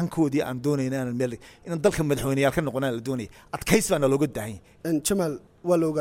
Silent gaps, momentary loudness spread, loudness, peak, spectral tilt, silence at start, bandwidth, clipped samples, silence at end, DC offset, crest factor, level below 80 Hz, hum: none; 11 LU; -25 LUFS; -4 dBFS; -5.5 dB/octave; 0 s; 16.5 kHz; under 0.1%; 0 s; under 0.1%; 20 dB; -50 dBFS; none